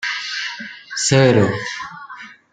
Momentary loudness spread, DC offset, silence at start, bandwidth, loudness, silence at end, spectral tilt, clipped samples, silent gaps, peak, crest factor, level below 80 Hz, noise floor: 21 LU; under 0.1%; 0 s; 9.6 kHz; -18 LUFS; 0.2 s; -4.5 dB/octave; under 0.1%; none; -2 dBFS; 18 dB; -56 dBFS; -38 dBFS